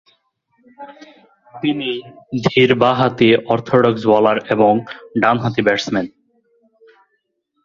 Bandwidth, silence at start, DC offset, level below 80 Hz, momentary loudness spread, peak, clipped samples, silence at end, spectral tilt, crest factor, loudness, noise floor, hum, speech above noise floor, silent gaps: 7.4 kHz; 0.8 s; under 0.1%; -54 dBFS; 12 LU; 0 dBFS; under 0.1%; 1.55 s; -6.5 dB/octave; 18 dB; -16 LUFS; -69 dBFS; none; 53 dB; none